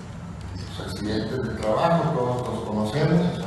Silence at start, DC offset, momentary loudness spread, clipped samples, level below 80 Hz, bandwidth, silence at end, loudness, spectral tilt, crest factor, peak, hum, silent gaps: 0 s; under 0.1%; 14 LU; under 0.1%; -44 dBFS; 12.5 kHz; 0 s; -25 LUFS; -7 dB/octave; 18 dB; -8 dBFS; none; none